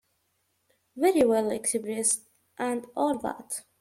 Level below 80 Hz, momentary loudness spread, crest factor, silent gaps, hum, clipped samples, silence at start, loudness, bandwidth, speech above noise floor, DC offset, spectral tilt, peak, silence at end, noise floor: -68 dBFS; 11 LU; 18 dB; none; none; under 0.1%; 0.95 s; -27 LUFS; 16.5 kHz; 47 dB; under 0.1%; -3 dB/octave; -10 dBFS; 0.2 s; -74 dBFS